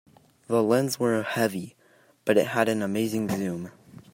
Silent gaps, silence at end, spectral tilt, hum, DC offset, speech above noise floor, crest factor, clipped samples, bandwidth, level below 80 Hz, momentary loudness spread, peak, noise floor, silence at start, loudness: none; 0.45 s; -5.5 dB/octave; none; under 0.1%; 35 dB; 20 dB; under 0.1%; 16 kHz; -68 dBFS; 13 LU; -6 dBFS; -60 dBFS; 0.5 s; -26 LUFS